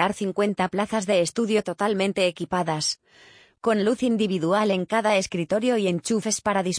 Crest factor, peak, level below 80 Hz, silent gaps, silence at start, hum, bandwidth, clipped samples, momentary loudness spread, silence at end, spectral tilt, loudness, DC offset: 16 dB; -8 dBFS; -62 dBFS; none; 0 s; none; 10.5 kHz; under 0.1%; 3 LU; 0 s; -4.5 dB/octave; -24 LUFS; under 0.1%